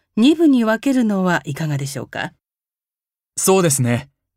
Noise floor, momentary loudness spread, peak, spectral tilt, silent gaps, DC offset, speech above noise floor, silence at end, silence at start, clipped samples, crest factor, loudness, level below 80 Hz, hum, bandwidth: under -90 dBFS; 13 LU; -4 dBFS; -5 dB/octave; none; under 0.1%; over 74 dB; 0.35 s; 0.15 s; under 0.1%; 14 dB; -17 LUFS; -60 dBFS; none; 16 kHz